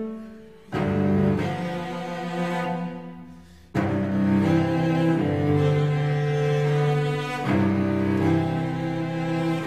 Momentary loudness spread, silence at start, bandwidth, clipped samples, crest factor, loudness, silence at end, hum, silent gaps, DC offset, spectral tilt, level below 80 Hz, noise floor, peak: 10 LU; 0 s; 11 kHz; under 0.1%; 14 dB; -24 LUFS; 0 s; none; none; 0.2%; -8 dB/octave; -52 dBFS; -46 dBFS; -10 dBFS